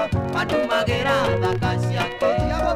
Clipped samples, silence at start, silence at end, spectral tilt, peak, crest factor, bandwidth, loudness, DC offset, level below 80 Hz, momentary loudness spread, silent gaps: under 0.1%; 0 s; 0 s; -6 dB/octave; -8 dBFS; 14 dB; 15.5 kHz; -21 LUFS; under 0.1%; -36 dBFS; 3 LU; none